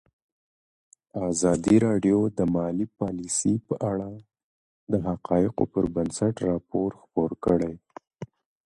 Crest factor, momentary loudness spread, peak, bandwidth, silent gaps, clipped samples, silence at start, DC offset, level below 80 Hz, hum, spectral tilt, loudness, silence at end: 20 dB; 13 LU; -8 dBFS; 11.5 kHz; 4.43-4.87 s; under 0.1%; 1.15 s; under 0.1%; -52 dBFS; none; -6.5 dB/octave; -26 LUFS; 0.4 s